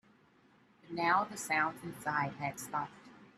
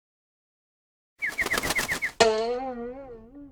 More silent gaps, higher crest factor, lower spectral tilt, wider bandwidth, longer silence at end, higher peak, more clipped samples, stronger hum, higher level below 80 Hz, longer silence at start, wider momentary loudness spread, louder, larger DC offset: neither; about the same, 20 dB vs 24 dB; first, -4 dB/octave vs -2 dB/octave; second, 14 kHz vs over 20 kHz; about the same, 0.1 s vs 0 s; second, -16 dBFS vs -6 dBFS; neither; neither; second, -76 dBFS vs -52 dBFS; second, 0.85 s vs 1.2 s; second, 10 LU vs 20 LU; second, -35 LUFS vs -26 LUFS; neither